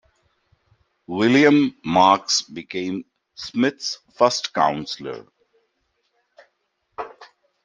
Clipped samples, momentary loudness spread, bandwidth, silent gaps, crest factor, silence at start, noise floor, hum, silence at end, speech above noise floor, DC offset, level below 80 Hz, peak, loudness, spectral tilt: under 0.1%; 20 LU; 9.4 kHz; none; 22 dB; 1.1 s; -72 dBFS; none; 0.4 s; 52 dB; under 0.1%; -64 dBFS; -2 dBFS; -20 LUFS; -4 dB/octave